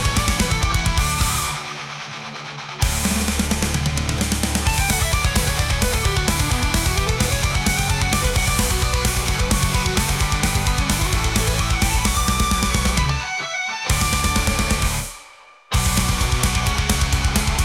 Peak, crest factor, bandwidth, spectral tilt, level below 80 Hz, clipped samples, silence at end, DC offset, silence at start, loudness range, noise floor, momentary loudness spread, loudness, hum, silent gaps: -2 dBFS; 18 dB; 17.5 kHz; -3.5 dB/octave; -24 dBFS; under 0.1%; 0 s; under 0.1%; 0 s; 2 LU; -46 dBFS; 5 LU; -20 LUFS; none; none